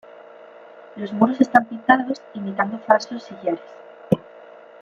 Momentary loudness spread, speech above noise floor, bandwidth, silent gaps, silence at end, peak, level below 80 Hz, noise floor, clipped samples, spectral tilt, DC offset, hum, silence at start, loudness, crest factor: 13 LU; 23 dB; 7.4 kHz; none; 0.35 s; -2 dBFS; -64 dBFS; -44 dBFS; under 0.1%; -6.5 dB/octave; under 0.1%; none; 0.75 s; -21 LUFS; 20 dB